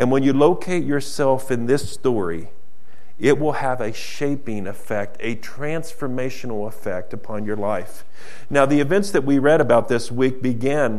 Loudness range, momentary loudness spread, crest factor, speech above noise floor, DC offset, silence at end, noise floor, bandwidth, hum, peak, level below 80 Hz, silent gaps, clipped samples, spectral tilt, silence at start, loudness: 8 LU; 12 LU; 20 dB; 34 dB; 7%; 0 s; -55 dBFS; 14 kHz; none; 0 dBFS; -56 dBFS; none; under 0.1%; -6 dB/octave; 0 s; -21 LUFS